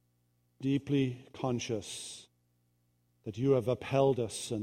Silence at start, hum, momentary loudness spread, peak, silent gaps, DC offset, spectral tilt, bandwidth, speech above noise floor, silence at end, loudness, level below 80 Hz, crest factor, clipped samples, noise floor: 0.6 s; 60 Hz at -60 dBFS; 15 LU; -14 dBFS; none; under 0.1%; -6 dB/octave; 15 kHz; 42 dB; 0 s; -33 LUFS; -66 dBFS; 20 dB; under 0.1%; -74 dBFS